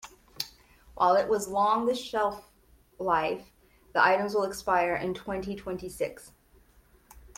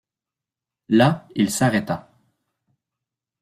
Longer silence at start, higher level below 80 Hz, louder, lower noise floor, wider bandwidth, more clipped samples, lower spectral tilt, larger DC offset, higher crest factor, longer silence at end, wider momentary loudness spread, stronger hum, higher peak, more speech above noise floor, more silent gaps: second, 0.05 s vs 0.9 s; about the same, -58 dBFS vs -58 dBFS; second, -28 LUFS vs -20 LUFS; second, -60 dBFS vs -88 dBFS; about the same, 16.5 kHz vs 15.5 kHz; neither; second, -4 dB/octave vs -5.5 dB/octave; neither; about the same, 22 dB vs 20 dB; second, 0.2 s vs 1.4 s; first, 14 LU vs 11 LU; neither; second, -8 dBFS vs -4 dBFS; second, 33 dB vs 69 dB; neither